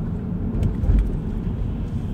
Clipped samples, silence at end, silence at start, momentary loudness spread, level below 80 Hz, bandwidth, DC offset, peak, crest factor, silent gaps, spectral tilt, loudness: under 0.1%; 0 s; 0 s; 6 LU; -24 dBFS; 4 kHz; under 0.1%; -8 dBFS; 16 dB; none; -10 dB/octave; -25 LUFS